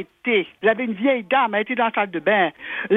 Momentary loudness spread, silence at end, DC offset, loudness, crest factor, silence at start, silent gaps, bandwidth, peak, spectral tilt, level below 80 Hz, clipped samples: 3 LU; 0 s; under 0.1%; -21 LUFS; 16 dB; 0 s; none; 4 kHz; -4 dBFS; -7.5 dB/octave; -70 dBFS; under 0.1%